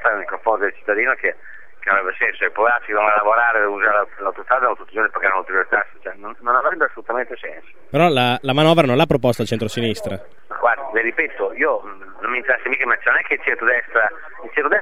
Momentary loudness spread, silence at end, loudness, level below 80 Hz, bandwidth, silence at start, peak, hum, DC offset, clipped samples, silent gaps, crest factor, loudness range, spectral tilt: 12 LU; 0 s; -18 LUFS; -54 dBFS; 16 kHz; 0 s; 0 dBFS; none; 2%; under 0.1%; none; 18 dB; 3 LU; -5.5 dB/octave